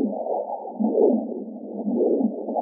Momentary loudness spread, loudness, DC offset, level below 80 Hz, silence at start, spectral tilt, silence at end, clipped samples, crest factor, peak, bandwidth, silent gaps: 12 LU; -24 LUFS; under 0.1%; -88 dBFS; 0 s; -0.5 dB/octave; 0 s; under 0.1%; 16 dB; -8 dBFS; 1 kHz; none